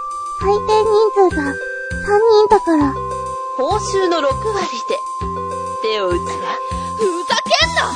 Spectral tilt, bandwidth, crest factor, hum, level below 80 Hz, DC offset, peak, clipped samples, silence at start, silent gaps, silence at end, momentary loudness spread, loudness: -4 dB/octave; 10 kHz; 16 dB; none; -36 dBFS; under 0.1%; 0 dBFS; under 0.1%; 0 s; none; 0 s; 11 LU; -17 LUFS